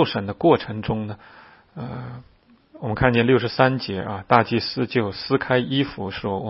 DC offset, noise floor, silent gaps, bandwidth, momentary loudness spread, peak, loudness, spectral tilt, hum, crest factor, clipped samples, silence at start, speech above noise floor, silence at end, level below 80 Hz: under 0.1%; -50 dBFS; none; 5.8 kHz; 16 LU; 0 dBFS; -21 LUFS; -10 dB/octave; none; 22 dB; under 0.1%; 0 s; 28 dB; 0 s; -48 dBFS